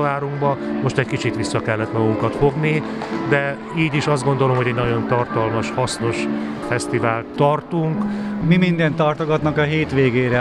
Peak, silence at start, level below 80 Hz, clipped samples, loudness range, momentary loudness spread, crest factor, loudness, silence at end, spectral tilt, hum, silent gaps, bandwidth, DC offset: -2 dBFS; 0 s; -46 dBFS; under 0.1%; 2 LU; 5 LU; 16 dB; -19 LUFS; 0 s; -6.5 dB/octave; none; none; 11.5 kHz; under 0.1%